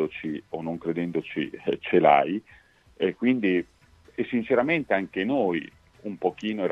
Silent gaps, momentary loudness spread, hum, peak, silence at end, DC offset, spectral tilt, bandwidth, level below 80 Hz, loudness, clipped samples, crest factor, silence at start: none; 13 LU; none; -6 dBFS; 0 s; under 0.1%; -7.5 dB/octave; 7.4 kHz; -62 dBFS; -26 LUFS; under 0.1%; 20 dB; 0 s